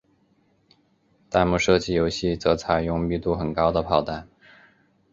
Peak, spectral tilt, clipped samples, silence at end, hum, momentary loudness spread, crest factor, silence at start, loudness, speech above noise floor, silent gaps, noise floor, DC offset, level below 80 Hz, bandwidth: -4 dBFS; -5.5 dB/octave; under 0.1%; 0.9 s; none; 5 LU; 22 dB; 1.3 s; -23 LUFS; 42 dB; none; -64 dBFS; under 0.1%; -42 dBFS; 7.8 kHz